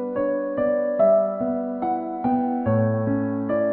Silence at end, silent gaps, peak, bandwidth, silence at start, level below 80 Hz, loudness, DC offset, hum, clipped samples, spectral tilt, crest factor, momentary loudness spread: 0 s; none; -8 dBFS; 4 kHz; 0 s; -56 dBFS; -23 LUFS; under 0.1%; none; under 0.1%; -13.5 dB/octave; 14 dB; 7 LU